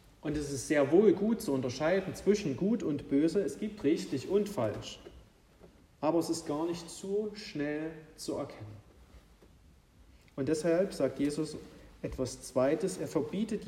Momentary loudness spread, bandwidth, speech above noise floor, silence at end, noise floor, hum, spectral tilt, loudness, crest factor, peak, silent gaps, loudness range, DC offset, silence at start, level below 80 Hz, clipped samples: 13 LU; 15.5 kHz; 29 dB; 0 s; -61 dBFS; none; -6 dB/octave; -32 LUFS; 20 dB; -12 dBFS; none; 9 LU; under 0.1%; 0.25 s; -58 dBFS; under 0.1%